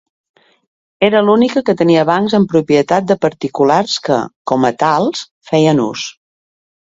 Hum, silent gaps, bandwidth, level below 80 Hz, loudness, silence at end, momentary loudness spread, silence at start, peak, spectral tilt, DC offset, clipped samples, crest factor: none; 4.36-4.45 s, 5.31-5.41 s; 7.8 kHz; -56 dBFS; -13 LUFS; 0.75 s; 7 LU; 1 s; 0 dBFS; -5.5 dB/octave; under 0.1%; under 0.1%; 14 dB